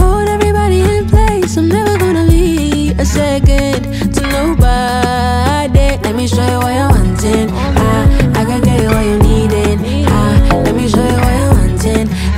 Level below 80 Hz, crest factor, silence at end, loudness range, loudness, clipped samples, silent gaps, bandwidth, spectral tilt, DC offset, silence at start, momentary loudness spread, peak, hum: -16 dBFS; 10 dB; 0 s; 1 LU; -12 LUFS; under 0.1%; none; 16 kHz; -6 dB/octave; under 0.1%; 0 s; 3 LU; 0 dBFS; none